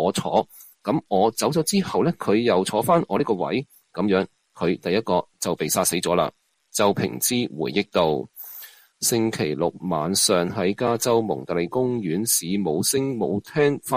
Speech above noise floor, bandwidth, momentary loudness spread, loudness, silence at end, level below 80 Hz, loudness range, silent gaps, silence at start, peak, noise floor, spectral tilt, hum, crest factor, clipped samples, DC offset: 21 dB; 15.5 kHz; 7 LU; -23 LUFS; 0 s; -58 dBFS; 2 LU; none; 0 s; -6 dBFS; -44 dBFS; -4 dB/octave; none; 18 dB; under 0.1%; under 0.1%